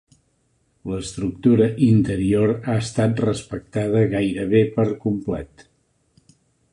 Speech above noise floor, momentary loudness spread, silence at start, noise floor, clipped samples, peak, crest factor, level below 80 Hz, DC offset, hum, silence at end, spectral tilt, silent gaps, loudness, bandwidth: 46 dB; 12 LU; 0.85 s; -65 dBFS; under 0.1%; -4 dBFS; 16 dB; -46 dBFS; under 0.1%; none; 1.25 s; -7.5 dB/octave; none; -21 LUFS; 11 kHz